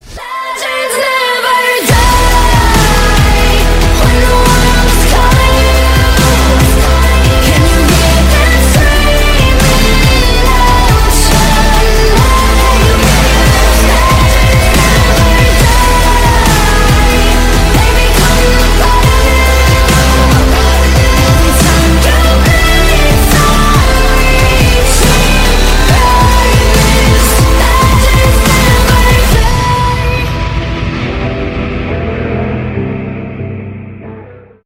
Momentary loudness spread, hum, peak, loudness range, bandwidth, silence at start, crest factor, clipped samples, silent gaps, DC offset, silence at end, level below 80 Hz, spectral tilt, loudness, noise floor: 8 LU; none; 0 dBFS; 3 LU; 16.5 kHz; 0.05 s; 6 dB; under 0.1%; none; under 0.1%; 0.4 s; -10 dBFS; -4.5 dB/octave; -8 LUFS; -32 dBFS